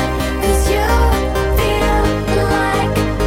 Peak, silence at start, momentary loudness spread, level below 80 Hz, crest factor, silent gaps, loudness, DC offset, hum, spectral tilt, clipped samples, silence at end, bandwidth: -2 dBFS; 0 s; 3 LU; -20 dBFS; 12 dB; none; -16 LUFS; under 0.1%; none; -5.5 dB/octave; under 0.1%; 0 s; 17 kHz